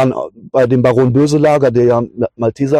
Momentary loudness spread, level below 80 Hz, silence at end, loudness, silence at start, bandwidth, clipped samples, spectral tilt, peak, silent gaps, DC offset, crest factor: 7 LU; -46 dBFS; 0 s; -13 LUFS; 0 s; 11 kHz; under 0.1%; -7.5 dB/octave; 0 dBFS; none; under 0.1%; 12 dB